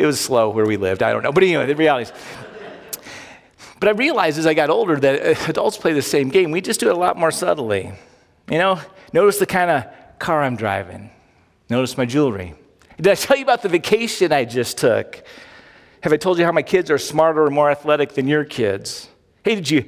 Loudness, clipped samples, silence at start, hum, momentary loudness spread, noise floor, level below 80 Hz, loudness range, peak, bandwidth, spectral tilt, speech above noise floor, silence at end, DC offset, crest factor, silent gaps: -18 LUFS; under 0.1%; 0 s; none; 15 LU; -56 dBFS; -52 dBFS; 3 LU; -2 dBFS; 16 kHz; -4.5 dB/octave; 38 dB; 0.05 s; under 0.1%; 18 dB; none